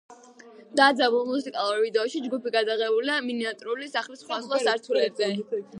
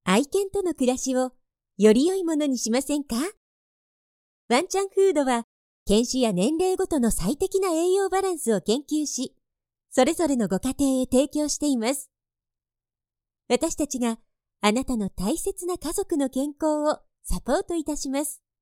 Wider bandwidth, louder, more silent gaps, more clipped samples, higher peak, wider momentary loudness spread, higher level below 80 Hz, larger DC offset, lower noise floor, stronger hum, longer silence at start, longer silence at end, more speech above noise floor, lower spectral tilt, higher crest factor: second, 11 kHz vs 16.5 kHz; about the same, -25 LUFS vs -24 LUFS; second, none vs 3.37-4.49 s, 5.44-5.86 s; neither; about the same, -6 dBFS vs -8 dBFS; first, 10 LU vs 7 LU; second, -84 dBFS vs -44 dBFS; neither; second, -49 dBFS vs under -90 dBFS; neither; about the same, 0.1 s vs 0.05 s; second, 0 s vs 0.25 s; second, 24 dB vs over 66 dB; about the same, -3.5 dB/octave vs -4.5 dB/octave; about the same, 20 dB vs 18 dB